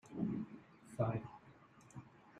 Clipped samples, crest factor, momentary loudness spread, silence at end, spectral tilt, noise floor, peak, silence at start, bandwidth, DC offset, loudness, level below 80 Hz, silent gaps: under 0.1%; 22 dB; 21 LU; 0 s; -9 dB/octave; -63 dBFS; -24 dBFS; 0.05 s; 11 kHz; under 0.1%; -43 LUFS; -72 dBFS; none